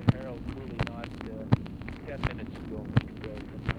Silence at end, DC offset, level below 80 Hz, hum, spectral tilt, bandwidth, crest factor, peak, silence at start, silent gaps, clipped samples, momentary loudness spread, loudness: 0 s; under 0.1%; -44 dBFS; none; -8 dB/octave; 9.2 kHz; 26 dB; -6 dBFS; 0 s; none; under 0.1%; 10 LU; -34 LUFS